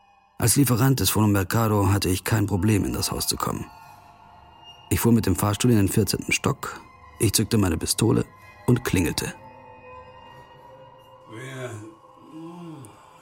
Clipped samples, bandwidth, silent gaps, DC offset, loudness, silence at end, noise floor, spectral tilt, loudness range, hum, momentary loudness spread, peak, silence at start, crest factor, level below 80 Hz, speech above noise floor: under 0.1%; 17 kHz; none; under 0.1%; -22 LUFS; 0.3 s; -49 dBFS; -5 dB/octave; 17 LU; none; 21 LU; -4 dBFS; 0.4 s; 20 dB; -46 dBFS; 28 dB